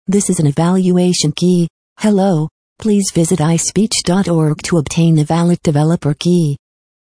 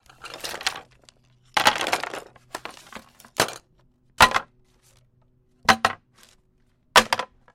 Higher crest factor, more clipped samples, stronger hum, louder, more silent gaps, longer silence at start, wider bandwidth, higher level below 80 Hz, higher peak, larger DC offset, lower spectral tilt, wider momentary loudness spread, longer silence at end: second, 12 dB vs 24 dB; neither; neither; first, -14 LUFS vs -22 LUFS; first, 1.70-1.96 s, 2.51-2.76 s vs none; second, 0.1 s vs 0.25 s; second, 10.5 kHz vs 16.5 kHz; first, -46 dBFS vs -52 dBFS; about the same, -2 dBFS vs -2 dBFS; first, 0.2% vs under 0.1%; first, -5.5 dB/octave vs -1.5 dB/octave; second, 5 LU vs 22 LU; first, 0.55 s vs 0.3 s